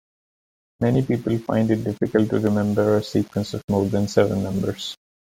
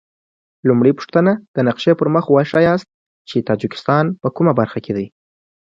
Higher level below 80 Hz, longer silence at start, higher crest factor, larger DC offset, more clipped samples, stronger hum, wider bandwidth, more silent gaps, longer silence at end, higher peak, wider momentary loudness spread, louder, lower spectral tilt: about the same, -52 dBFS vs -56 dBFS; first, 0.8 s vs 0.65 s; about the same, 18 dB vs 16 dB; neither; neither; neither; first, 16 kHz vs 7.6 kHz; second, 3.64-3.68 s vs 1.48-1.54 s, 2.94-3.25 s; second, 0.35 s vs 0.7 s; second, -4 dBFS vs 0 dBFS; second, 6 LU vs 9 LU; second, -22 LUFS vs -16 LUFS; second, -7 dB/octave vs -8.5 dB/octave